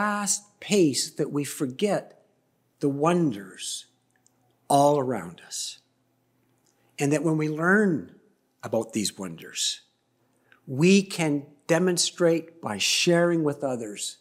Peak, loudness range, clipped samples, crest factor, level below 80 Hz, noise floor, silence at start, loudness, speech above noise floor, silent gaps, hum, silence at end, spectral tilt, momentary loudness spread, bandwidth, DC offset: -6 dBFS; 5 LU; under 0.1%; 20 dB; -74 dBFS; -69 dBFS; 0 s; -25 LUFS; 45 dB; none; none; 0.05 s; -4 dB/octave; 13 LU; 16 kHz; under 0.1%